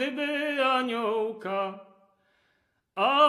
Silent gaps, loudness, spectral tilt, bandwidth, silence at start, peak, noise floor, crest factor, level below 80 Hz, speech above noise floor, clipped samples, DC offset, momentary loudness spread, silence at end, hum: none; -28 LUFS; -4 dB/octave; 13 kHz; 0 s; -8 dBFS; -73 dBFS; 18 dB; -86 dBFS; 47 dB; under 0.1%; under 0.1%; 11 LU; 0 s; none